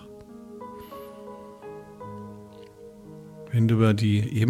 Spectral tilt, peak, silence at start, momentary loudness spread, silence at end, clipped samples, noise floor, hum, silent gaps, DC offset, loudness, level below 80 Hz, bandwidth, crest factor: -8 dB/octave; -10 dBFS; 0.05 s; 24 LU; 0 s; under 0.1%; -46 dBFS; none; none; under 0.1%; -23 LUFS; -60 dBFS; 13 kHz; 18 dB